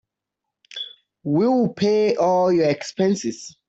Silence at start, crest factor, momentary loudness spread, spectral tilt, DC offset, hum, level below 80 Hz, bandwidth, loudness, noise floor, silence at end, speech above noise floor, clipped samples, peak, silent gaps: 0.75 s; 14 dB; 15 LU; -6 dB/octave; under 0.1%; none; -64 dBFS; 8.2 kHz; -20 LUFS; -83 dBFS; 0.2 s; 64 dB; under 0.1%; -8 dBFS; none